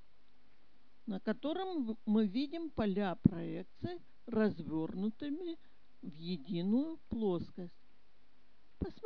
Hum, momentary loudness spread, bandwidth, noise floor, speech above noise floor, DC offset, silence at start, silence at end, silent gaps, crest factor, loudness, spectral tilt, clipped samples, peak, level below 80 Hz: none; 15 LU; 5.4 kHz; -73 dBFS; 36 dB; 0.4%; 1.05 s; 0.15 s; none; 26 dB; -37 LUFS; -7 dB/octave; under 0.1%; -10 dBFS; -60 dBFS